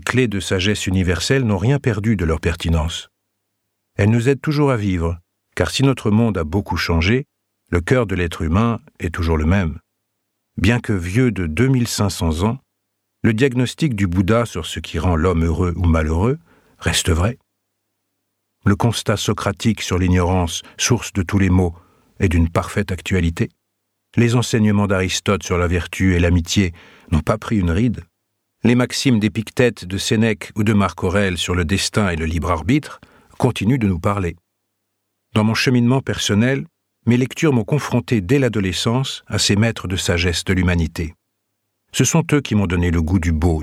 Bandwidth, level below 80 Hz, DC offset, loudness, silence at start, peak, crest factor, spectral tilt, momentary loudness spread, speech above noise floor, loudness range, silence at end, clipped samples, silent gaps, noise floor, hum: 15 kHz; -32 dBFS; under 0.1%; -18 LUFS; 0 s; 0 dBFS; 18 dB; -5.5 dB/octave; 7 LU; 56 dB; 2 LU; 0 s; under 0.1%; none; -74 dBFS; none